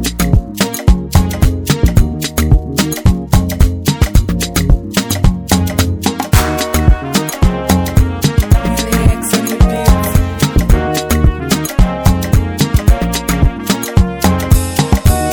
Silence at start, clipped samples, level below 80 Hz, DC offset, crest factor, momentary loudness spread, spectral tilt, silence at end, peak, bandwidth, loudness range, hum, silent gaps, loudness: 0 s; 2%; -16 dBFS; under 0.1%; 12 dB; 3 LU; -5.5 dB/octave; 0 s; 0 dBFS; over 20 kHz; 1 LU; none; none; -13 LUFS